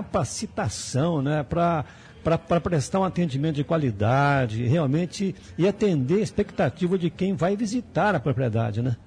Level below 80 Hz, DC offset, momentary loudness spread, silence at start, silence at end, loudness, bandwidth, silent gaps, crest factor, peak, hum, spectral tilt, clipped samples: -50 dBFS; under 0.1%; 6 LU; 0 s; 0.05 s; -24 LUFS; 10.5 kHz; none; 14 dB; -10 dBFS; none; -6.5 dB/octave; under 0.1%